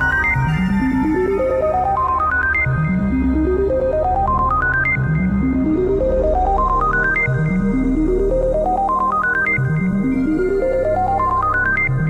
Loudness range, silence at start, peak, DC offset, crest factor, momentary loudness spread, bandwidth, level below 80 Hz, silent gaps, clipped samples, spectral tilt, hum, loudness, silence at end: 1 LU; 0 s; -6 dBFS; under 0.1%; 10 dB; 2 LU; 10.5 kHz; -26 dBFS; none; under 0.1%; -9 dB/octave; none; -17 LUFS; 0 s